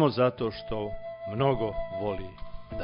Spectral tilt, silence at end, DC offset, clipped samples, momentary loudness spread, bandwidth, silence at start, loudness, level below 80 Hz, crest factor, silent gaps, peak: -11 dB/octave; 0 s; under 0.1%; under 0.1%; 14 LU; 5.4 kHz; 0 s; -30 LUFS; -46 dBFS; 18 dB; none; -12 dBFS